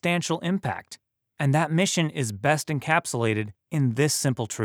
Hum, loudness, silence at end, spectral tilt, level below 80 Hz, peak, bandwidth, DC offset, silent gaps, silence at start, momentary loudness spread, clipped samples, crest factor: none; -25 LUFS; 0 s; -4.5 dB/octave; -66 dBFS; -6 dBFS; 17.5 kHz; under 0.1%; none; 0.05 s; 7 LU; under 0.1%; 20 dB